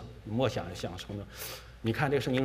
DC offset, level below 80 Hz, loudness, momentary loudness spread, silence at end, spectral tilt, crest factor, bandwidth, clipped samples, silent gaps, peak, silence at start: under 0.1%; -52 dBFS; -34 LUFS; 11 LU; 0 s; -6 dB/octave; 20 dB; 16 kHz; under 0.1%; none; -12 dBFS; 0 s